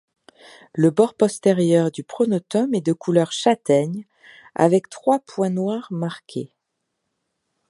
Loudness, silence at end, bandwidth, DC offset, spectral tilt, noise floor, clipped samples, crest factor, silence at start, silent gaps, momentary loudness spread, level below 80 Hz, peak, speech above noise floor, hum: -20 LUFS; 1.25 s; 11.5 kHz; under 0.1%; -6.5 dB/octave; -77 dBFS; under 0.1%; 20 dB; 0.75 s; none; 14 LU; -70 dBFS; -2 dBFS; 58 dB; none